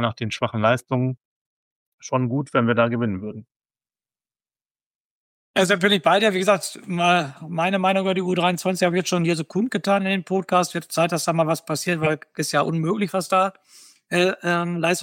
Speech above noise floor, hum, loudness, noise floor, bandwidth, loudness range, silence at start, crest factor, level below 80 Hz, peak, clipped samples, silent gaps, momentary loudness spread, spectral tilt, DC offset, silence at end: over 69 dB; none; -21 LUFS; under -90 dBFS; 17 kHz; 5 LU; 0 s; 18 dB; -66 dBFS; -4 dBFS; under 0.1%; 1.25-1.98 s, 3.56-3.60 s, 4.71-4.75 s, 4.86-5.54 s; 8 LU; -5 dB/octave; under 0.1%; 0 s